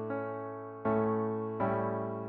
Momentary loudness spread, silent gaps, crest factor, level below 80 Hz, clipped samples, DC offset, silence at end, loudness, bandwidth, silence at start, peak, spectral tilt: 9 LU; none; 14 dB; -68 dBFS; under 0.1%; under 0.1%; 0 s; -34 LUFS; 4.2 kHz; 0 s; -18 dBFS; -9 dB/octave